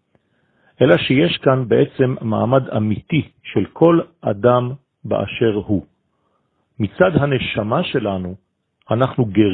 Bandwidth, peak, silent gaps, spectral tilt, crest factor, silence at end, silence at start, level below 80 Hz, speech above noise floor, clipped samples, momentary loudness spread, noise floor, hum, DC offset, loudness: 4.5 kHz; 0 dBFS; none; -10 dB/octave; 18 dB; 0 s; 0.8 s; -50 dBFS; 49 dB; under 0.1%; 9 LU; -66 dBFS; none; under 0.1%; -18 LUFS